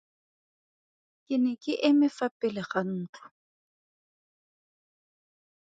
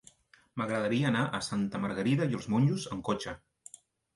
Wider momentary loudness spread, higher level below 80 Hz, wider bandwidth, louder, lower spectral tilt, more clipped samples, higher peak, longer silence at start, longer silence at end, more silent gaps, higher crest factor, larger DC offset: second, 11 LU vs 18 LU; second, -78 dBFS vs -62 dBFS; second, 7.8 kHz vs 11.5 kHz; first, -28 LUFS vs -31 LUFS; about the same, -6.5 dB/octave vs -6 dB/octave; neither; first, -10 dBFS vs -16 dBFS; first, 1.3 s vs 0.55 s; first, 2.6 s vs 0.8 s; first, 2.31-2.40 s, 3.09-3.13 s vs none; first, 22 dB vs 16 dB; neither